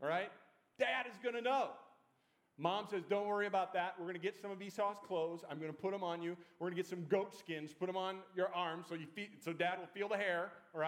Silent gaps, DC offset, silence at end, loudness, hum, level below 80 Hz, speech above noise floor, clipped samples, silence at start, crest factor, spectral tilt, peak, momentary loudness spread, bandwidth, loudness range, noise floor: none; under 0.1%; 0 s; -41 LUFS; none; under -90 dBFS; 37 dB; under 0.1%; 0 s; 20 dB; -5.5 dB/octave; -22 dBFS; 9 LU; 16 kHz; 2 LU; -78 dBFS